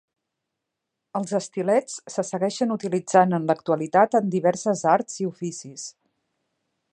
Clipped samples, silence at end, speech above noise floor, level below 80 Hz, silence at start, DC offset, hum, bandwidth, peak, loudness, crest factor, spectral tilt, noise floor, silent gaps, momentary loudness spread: under 0.1%; 1.05 s; 60 dB; -76 dBFS; 1.15 s; under 0.1%; none; 10.5 kHz; -4 dBFS; -23 LUFS; 22 dB; -5.5 dB/octave; -83 dBFS; none; 14 LU